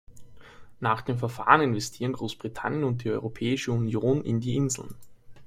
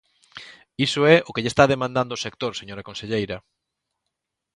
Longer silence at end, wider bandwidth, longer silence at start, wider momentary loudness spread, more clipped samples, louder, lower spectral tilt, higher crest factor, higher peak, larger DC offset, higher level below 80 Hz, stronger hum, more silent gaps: second, 0 s vs 1.15 s; first, 15.5 kHz vs 11.5 kHz; second, 0.1 s vs 0.35 s; second, 12 LU vs 22 LU; neither; second, -27 LUFS vs -21 LUFS; about the same, -5.5 dB/octave vs -5 dB/octave; about the same, 26 dB vs 22 dB; about the same, -2 dBFS vs -2 dBFS; neither; about the same, -56 dBFS vs -54 dBFS; neither; neither